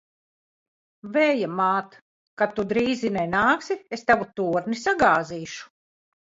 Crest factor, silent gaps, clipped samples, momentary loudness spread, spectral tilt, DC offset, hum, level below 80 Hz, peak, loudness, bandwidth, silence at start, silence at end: 20 dB; 2.02-2.37 s; under 0.1%; 9 LU; -5 dB/octave; under 0.1%; none; -58 dBFS; -6 dBFS; -23 LUFS; 7.8 kHz; 1.05 s; 0.75 s